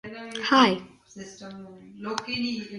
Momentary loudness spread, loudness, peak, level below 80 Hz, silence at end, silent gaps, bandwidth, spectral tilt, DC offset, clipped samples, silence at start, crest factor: 24 LU; -24 LUFS; -6 dBFS; -66 dBFS; 0 s; none; 11 kHz; -4 dB/octave; under 0.1%; under 0.1%; 0.05 s; 22 dB